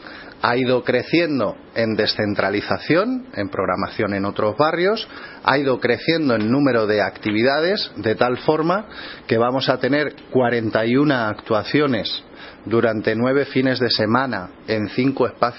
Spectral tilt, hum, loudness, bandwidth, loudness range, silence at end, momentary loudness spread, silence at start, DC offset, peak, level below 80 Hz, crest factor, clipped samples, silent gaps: -9.5 dB/octave; none; -20 LUFS; 5.8 kHz; 2 LU; 0 s; 7 LU; 0 s; under 0.1%; 0 dBFS; -56 dBFS; 20 dB; under 0.1%; none